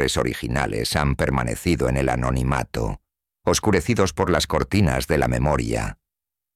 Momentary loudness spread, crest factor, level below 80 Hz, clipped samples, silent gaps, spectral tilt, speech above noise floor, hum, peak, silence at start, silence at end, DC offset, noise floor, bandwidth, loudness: 7 LU; 18 dB; -32 dBFS; under 0.1%; none; -5 dB/octave; 66 dB; none; -4 dBFS; 0 s; 0.6 s; 0.1%; -87 dBFS; 16 kHz; -22 LUFS